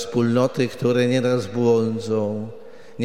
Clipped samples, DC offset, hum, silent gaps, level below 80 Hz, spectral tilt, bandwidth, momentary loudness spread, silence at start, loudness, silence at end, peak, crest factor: under 0.1%; 0.7%; none; none; -62 dBFS; -6.5 dB/octave; 13.5 kHz; 7 LU; 0 s; -21 LUFS; 0 s; -6 dBFS; 16 dB